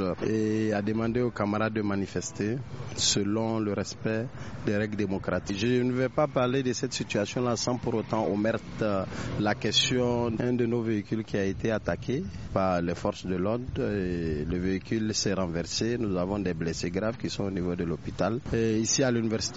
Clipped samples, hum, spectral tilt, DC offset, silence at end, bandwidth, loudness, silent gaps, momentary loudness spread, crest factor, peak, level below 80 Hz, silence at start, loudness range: under 0.1%; none; -5 dB/octave; 0.2%; 0 s; 8 kHz; -29 LUFS; none; 6 LU; 18 dB; -10 dBFS; -50 dBFS; 0 s; 2 LU